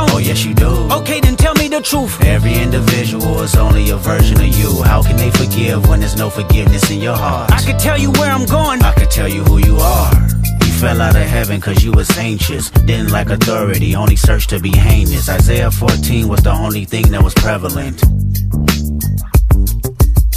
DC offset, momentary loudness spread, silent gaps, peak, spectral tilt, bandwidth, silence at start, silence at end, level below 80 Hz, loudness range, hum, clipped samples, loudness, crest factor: under 0.1%; 5 LU; none; 0 dBFS; -5.5 dB/octave; 15.5 kHz; 0 s; 0 s; -14 dBFS; 2 LU; none; under 0.1%; -12 LUFS; 10 dB